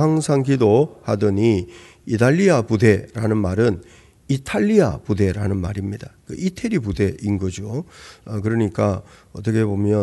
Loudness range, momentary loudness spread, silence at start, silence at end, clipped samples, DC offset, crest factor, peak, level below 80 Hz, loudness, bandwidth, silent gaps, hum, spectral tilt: 6 LU; 14 LU; 0 s; 0 s; under 0.1%; under 0.1%; 18 dB; -2 dBFS; -46 dBFS; -20 LUFS; 12 kHz; none; none; -7 dB/octave